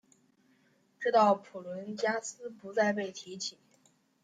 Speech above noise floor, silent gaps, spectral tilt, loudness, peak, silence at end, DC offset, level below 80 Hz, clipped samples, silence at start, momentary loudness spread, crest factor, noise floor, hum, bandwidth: 37 dB; none; -4 dB/octave; -32 LUFS; -12 dBFS; 0.7 s; under 0.1%; -86 dBFS; under 0.1%; 1 s; 16 LU; 20 dB; -69 dBFS; none; 9.6 kHz